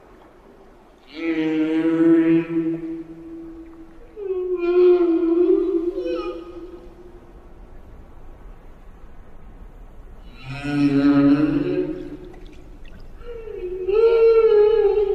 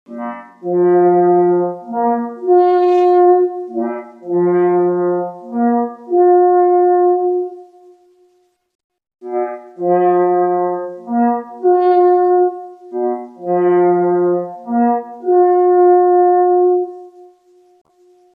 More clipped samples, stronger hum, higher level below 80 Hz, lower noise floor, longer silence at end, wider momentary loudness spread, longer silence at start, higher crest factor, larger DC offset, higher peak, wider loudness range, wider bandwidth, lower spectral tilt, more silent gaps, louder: neither; neither; first, -42 dBFS vs -82 dBFS; second, -48 dBFS vs -58 dBFS; second, 0 s vs 1.25 s; first, 22 LU vs 11 LU; first, 1.1 s vs 0.1 s; about the same, 14 dB vs 12 dB; neither; second, -6 dBFS vs -2 dBFS; first, 9 LU vs 5 LU; first, 6 kHz vs 4.2 kHz; second, -8.5 dB/octave vs -10 dB/octave; second, none vs 8.75-8.90 s; second, -19 LUFS vs -14 LUFS